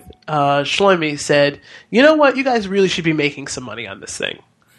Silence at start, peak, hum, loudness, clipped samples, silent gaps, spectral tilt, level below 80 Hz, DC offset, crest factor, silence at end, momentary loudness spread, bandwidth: 0.05 s; 0 dBFS; none; -16 LUFS; under 0.1%; none; -4.5 dB/octave; -54 dBFS; under 0.1%; 16 dB; 0.4 s; 14 LU; 12 kHz